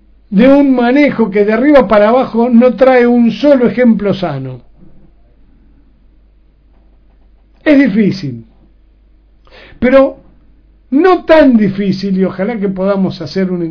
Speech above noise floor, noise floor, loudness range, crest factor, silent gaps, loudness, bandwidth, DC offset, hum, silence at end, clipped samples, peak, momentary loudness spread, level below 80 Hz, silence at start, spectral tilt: 37 dB; -46 dBFS; 9 LU; 12 dB; none; -10 LUFS; 5.4 kHz; under 0.1%; none; 0 s; 0.9%; 0 dBFS; 9 LU; -40 dBFS; 0.3 s; -8.5 dB/octave